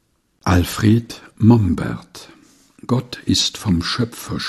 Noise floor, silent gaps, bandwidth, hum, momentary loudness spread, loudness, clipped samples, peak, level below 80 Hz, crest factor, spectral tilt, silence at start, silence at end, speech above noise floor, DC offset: -46 dBFS; none; 14 kHz; none; 19 LU; -18 LUFS; under 0.1%; 0 dBFS; -38 dBFS; 18 dB; -5.5 dB/octave; 0.45 s; 0 s; 29 dB; under 0.1%